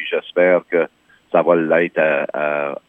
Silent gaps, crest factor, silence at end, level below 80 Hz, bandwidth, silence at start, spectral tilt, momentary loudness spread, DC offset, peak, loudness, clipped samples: none; 16 dB; 0.15 s; -72 dBFS; 3.8 kHz; 0 s; -8 dB/octave; 6 LU; under 0.1%; 0 dBFS; -17 LUFS; under 0.1%